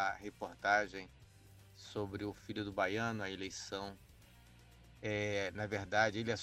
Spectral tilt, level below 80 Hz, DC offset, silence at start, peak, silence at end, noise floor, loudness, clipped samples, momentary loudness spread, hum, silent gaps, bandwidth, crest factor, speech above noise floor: -4.5 dB/octave; -66 dBFS; under 0.1%; 0 s; -18 dBFS; 0 s; -61 dBFS; -38 LUFS; under 0.1%; 14 LU; none; none; 16 kHz; 22 dB; 22 dB